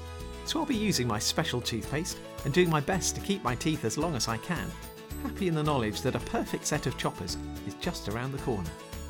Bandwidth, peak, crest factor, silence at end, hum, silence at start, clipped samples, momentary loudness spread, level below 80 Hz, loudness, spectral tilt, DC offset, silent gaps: 19 kHz; -12 dBFS; 18 dB; 0 s; none; 0 s; under 0.1%; 10 LU; -46 dBFS; -31 LUFS; -4.5 dB/octave; under 0.1%; none